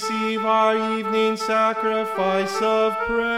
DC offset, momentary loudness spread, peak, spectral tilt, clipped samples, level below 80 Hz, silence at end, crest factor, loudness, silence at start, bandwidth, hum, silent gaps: 0.1%; 4 LU; -8 dBFS; -4.5 dB/octave; under 0.1%; -54 dBFS; 0 s; 14 dB; -21 LUFS; 0 s; 15.5 kHz; none; none